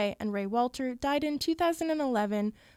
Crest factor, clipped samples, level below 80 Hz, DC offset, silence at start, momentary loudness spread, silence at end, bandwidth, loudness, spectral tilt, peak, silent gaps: 14 dB; under 0.1%; -60 dBFS; under 0.1%; 0 s; 4 LU; 0.25 s; 16 kHz; -30 LUFS; -5 dB/octave; -16 dBFS; none